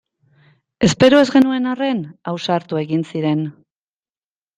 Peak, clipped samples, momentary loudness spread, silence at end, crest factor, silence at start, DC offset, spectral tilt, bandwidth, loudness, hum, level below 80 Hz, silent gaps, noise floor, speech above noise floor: -2 dBFS; under 0.1%; 13 LU; 1.05 s; 16 dB; 0.8 s; under 0.1%; -5.5 dB/octave; 9.4 kHz; -17 LUFS; none; -52 dBFS; none; under -90 dBFS; over 74 dB